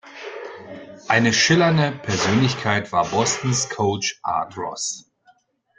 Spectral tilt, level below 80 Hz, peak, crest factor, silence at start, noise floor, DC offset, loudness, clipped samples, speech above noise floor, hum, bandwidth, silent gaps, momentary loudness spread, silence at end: -4 dB/octave; -56 dBFS; -2 dBFS; 20 dB; 0.05 s; -59 dBFS; under 0.1%; -20 LUFS; under 0.1%; 38 dB; none; 9.6 kHz; none; 20 LU; 0.8 s